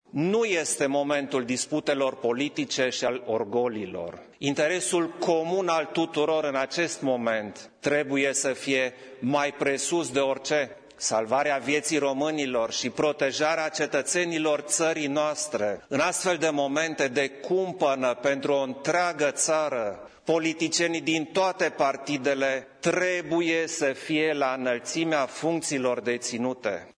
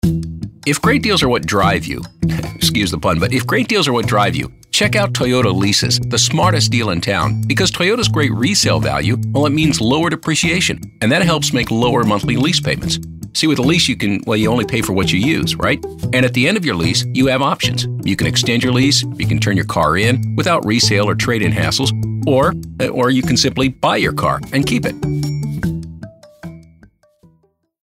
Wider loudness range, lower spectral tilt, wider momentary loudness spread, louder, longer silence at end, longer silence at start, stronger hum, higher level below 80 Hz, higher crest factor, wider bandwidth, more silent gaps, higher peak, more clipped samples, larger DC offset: about the same, 1 LU vs 2 LU; second, -3 dB/octave vs -4.5 dB/octave; second, 4 LU vs 7 LU; second, -26 LUFS vs -15 LUFS; second, 0.05 s vs 1.2 s; about the same, 0.15 s vs 0.05 s; neither; second, -70 dBFS vs -38 dBFS; about the same, 16 dB vs 14 dB; second, 11 kHz vs 16 kHz; neither; second, -10 dBFS vs -2 dBFS; neither; neither